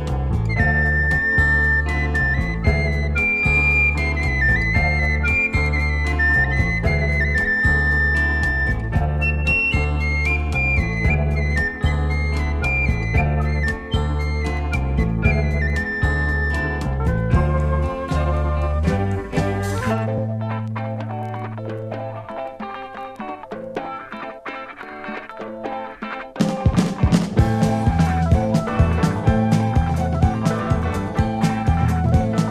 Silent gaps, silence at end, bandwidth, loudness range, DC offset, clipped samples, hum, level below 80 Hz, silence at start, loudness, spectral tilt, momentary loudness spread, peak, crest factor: none; 0 s; 11 kHz; 11 LU; under 0.1%; under 0.1%; none; -24 dBFS; 0 s; -20 LUFS; -7 dB/octave; 13 LU; -4 dBFS; 16 dB